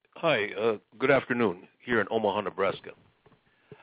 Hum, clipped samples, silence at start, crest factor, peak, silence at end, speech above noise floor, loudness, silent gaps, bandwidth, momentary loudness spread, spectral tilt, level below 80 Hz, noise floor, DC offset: none; under 0.1%; 0.15 s; 20 dB; -8 dBFS; 0.1 s; 36 dB; -28 LUFS; none; 4 kHz; 8 LU; -9 dB/octave; -64 dBFS; -63 dBFS; under 0.1%